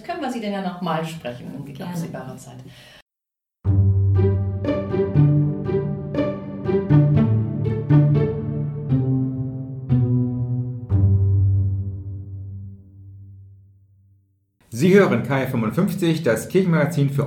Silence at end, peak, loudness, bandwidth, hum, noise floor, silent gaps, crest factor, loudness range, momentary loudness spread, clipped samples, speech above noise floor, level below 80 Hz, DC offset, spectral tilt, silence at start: 0 s; -2 dBFS; -21 LUFS; 15.5 kHz; none; -86 dBFS; 3.02-3.06 s; 18 dB; 8 LU; 17 LU; under 0.1%; 64 dB; -44 dBFS; under 0.1%; -8 dB/octave; 0.05 s